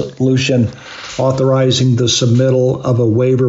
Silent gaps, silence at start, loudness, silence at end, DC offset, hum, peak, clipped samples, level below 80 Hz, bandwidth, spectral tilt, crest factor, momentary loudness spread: none; 0 s; -13 LUFS; 0 s; under 0.1%; none; -4 dBFS; under 0.1%; -48 dBFS; 7.8 kHz; -6 dB/octave; 10 dB; 6 LU